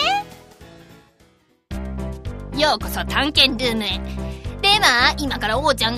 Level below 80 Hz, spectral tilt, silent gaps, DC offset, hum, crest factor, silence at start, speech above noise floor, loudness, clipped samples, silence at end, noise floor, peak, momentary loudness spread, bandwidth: -34 dBFS; -3 dB/octave; none; under 0.1%; none; 22 dB; 0 s; 38 dB; -18 LUFS; under 0.1%; 0 s; -57 dBFS; 0 dBFS; 17 LU; 15.5 kHz